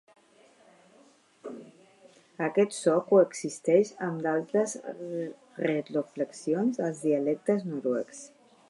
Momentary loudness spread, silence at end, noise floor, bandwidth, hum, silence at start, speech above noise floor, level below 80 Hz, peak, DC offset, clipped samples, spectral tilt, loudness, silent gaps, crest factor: 17 LU; 0.4 s; -60 dBFS; 11.5 kHz; none; 1.45 s; 33 dB; -84 dBFS; -10 dBFS; under 0.1%; under 0.1%; -6 dB/octave; -28 LUFS; none; 20 dB